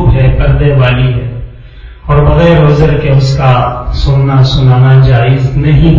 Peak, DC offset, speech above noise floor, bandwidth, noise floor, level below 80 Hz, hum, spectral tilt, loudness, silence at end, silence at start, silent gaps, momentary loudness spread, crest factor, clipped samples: 0 dBFS; under 0.1%; 23 dB; 7.2 kHz; -29 dBFS; -16 dBFS; none; -8.5 dB/octave; -8 LUFS; 0 s; 0 s; none; 8 LU; 6 dB; 1%